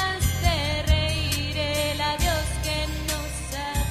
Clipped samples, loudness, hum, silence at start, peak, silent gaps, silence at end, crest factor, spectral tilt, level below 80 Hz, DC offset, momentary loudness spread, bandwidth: under 0.1%; -25 LUFS; none; 0 s; -8 dBFS; none; 0 s; 16 dB; -3.5 dB/octave; -30 dBFS; under 0.1%; 6 LU; 16 kHz